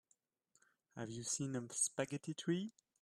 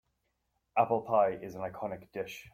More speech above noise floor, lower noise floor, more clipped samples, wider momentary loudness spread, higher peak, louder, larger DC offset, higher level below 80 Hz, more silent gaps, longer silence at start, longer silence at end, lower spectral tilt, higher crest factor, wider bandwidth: second, 39 dB vs 48 dB; about the same, -80 dBFS vs -80 dBFS; neither; about the same, 13 LU vs 12 LU; second, -24 dBFS vs -14 dBFS; second, -41 LUFS vs -32 LUFS; neither; second, -82 dBFS vs -68 dBFS; neither; first, 0.95 s vs 0.75 s; first, 0.3 s vs 0.05 s; second, -4 dB/octave vs -6.5 dB/octave; about the same, 20 dB vs 20 dB; second, 14 kHz vs 16 kHz